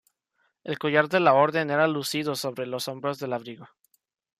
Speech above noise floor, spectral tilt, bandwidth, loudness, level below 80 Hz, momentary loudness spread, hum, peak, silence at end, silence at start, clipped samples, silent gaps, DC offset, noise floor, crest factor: 48 dB; -4.5 dB/octave; 15.5 kHz; -25 LUFS; -72 dBFS; 15 LU; none; -6 dBFS; 0.75 s; 0.65 s; under 0.1%; none; under 0.1%; -73 dBFS; 20 dB